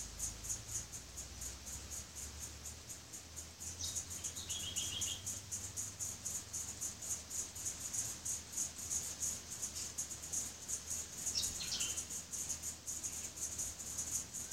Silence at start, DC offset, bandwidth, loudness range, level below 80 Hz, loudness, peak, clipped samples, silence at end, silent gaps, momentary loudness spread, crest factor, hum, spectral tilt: 0 s; under 0.1%; 16 kHz; 5 LU; -60 dBFS; -41 LUFS; -24 dBFS; under 0.1%; 0 s; none; 9 LU; 20 dB; none; -0.5 dB/octave